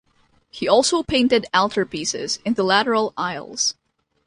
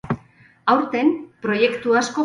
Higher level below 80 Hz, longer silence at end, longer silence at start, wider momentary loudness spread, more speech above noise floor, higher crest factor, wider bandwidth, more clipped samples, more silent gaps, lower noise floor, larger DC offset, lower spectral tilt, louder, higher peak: about the same, -52 dBFS vs -56 dBFS; first, 0.55 s vs 0 s; first, 0.55 s vs 0.05 s; second, 7 LU vs 10 LU; first, 41 dB vs 33 dB; about the same, 18 dB vs 18 dB; about the same, 11.5 kHz vs 11 kHz; neither; neither; first, -61 dBFS vs -51 dBFS; neither; second, -2.5 dB/octave vs -5 dB/octave; about the same, -20 LUFS vs -20 LUFS; about the same, -4 dBFS vs -4 dBFS